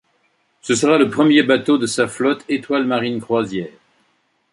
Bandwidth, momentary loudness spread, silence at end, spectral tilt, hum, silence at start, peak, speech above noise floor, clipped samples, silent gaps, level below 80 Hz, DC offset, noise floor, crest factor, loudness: 11.5 kHz; 11 LU; 0.85 s; -4.5 dB/octave; none; 0.65 s; -2 dBFS; 47 dB; under 0.1%; none; -60 dBFS; under 0.1%; -64 dBFS; 16 dB; -17 LUFS